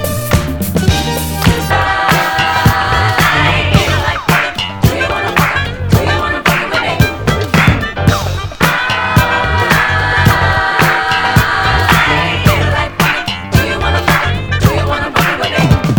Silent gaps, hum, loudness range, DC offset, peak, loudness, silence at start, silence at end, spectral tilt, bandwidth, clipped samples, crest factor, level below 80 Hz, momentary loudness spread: none; none; 2 LU; under 0.1%; 0 dBFS; -12 LUFS; 0 s; 0 s; -5 dB/octave; over 20 kHz; 0.3%; 12 dB; -24 dBFS; 4 LU